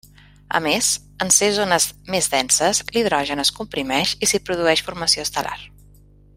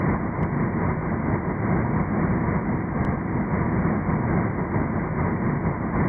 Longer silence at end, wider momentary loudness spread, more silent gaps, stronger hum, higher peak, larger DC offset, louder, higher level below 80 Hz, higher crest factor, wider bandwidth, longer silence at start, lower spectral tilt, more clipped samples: first, 0.7 s vs 0 s; first, 8 LU vs 2 LU; neither; first, 50 Hz at -45 dBFS vs none; first, 0 dBFS vs -10 dBFS; neither; first, -19 LUFS vs -25 LUFS; second, -50 dBFS vs -36 dBFS; first, 20 dB vs 12 dB; first, 16 kHz vs 2.6 kHz; first, 0.5 s vs 0 s; second, -1.5 dB/octave vs -12.5 dB/octave; neither